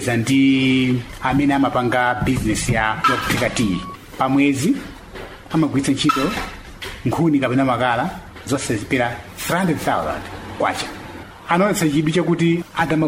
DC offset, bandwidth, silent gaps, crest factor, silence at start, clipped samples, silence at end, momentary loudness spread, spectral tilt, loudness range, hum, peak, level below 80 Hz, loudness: under 0.1%; 16 kHz; none; 16 dB; 0 s; under 0.1%; 0 s; 14 LU; -5 dB/octave; 3 LU; none; -4 dBFS; -40 dBFS; -19 LUFS